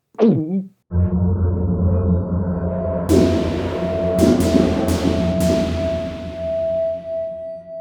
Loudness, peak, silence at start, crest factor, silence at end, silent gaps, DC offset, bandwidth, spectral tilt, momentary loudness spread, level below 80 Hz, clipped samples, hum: -19 LUFS; 0 dBFS; 0.2 s; 18 dB; 0 s; none; under 0.1%; 18 kHz; -7.5 dB/octave; 10 LU; -32 dBFS; under 0.1%; none